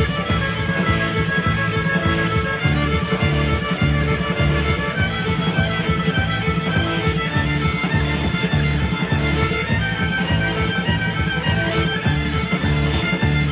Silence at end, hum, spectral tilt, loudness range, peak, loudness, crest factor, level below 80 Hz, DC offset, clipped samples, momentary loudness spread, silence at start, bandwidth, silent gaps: 0 s; none; -10 dB/octave; 1 LU; -6 dBFS; -19 LUFS; 14 dB; -28 dBFS; under 0.1%; under 0.1%; 2 LU; 0 s; 4 kHz; none